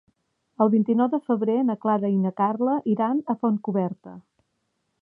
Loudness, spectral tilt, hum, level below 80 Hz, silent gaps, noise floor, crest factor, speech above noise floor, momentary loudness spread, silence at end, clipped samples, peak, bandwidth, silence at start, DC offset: -23 LUFS; -11.5 dB/octave; none; -78 dBFS; none; -75 dBFS; 18 dB; 52 dB; 5 LU; 0.85 s; under 0.1%; -6 dBFS; 3.4 kHz; 0.6 s; under 0.1%